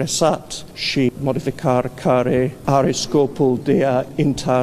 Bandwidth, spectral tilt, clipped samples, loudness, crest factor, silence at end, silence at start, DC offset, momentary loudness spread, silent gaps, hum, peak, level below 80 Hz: 15 kHz; -5.5 dB/octave; under 0.1%; -19 LUFS; 16 dB; 0 s; 0 s; under 0.1%; 5 LU; none; none; -2 dBFS; -46 dBFS